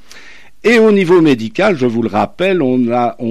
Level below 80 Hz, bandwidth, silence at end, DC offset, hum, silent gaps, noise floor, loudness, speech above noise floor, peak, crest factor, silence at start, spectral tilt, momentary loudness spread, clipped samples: -50 dBFS; 12.5 kHz; 0 s; 2%; none; none; -40 dBFS; -12 LUFS; 29 dB; -2 dBFS; 10 dB; 0.15 s; -6.5 dB/octave; 6 LU; under 0.1%